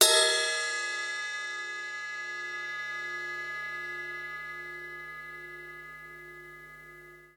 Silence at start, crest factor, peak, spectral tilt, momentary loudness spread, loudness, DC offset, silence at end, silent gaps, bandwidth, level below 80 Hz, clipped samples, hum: 0 s; 28 dB; -6 dBFS; 1 dB/octave; 18 LU; -31 LUFS; under 0.1%; 0.05 s; none; 19 kHz; -70 dBFS; under 0.1%; 50 Hz at -65 dBFS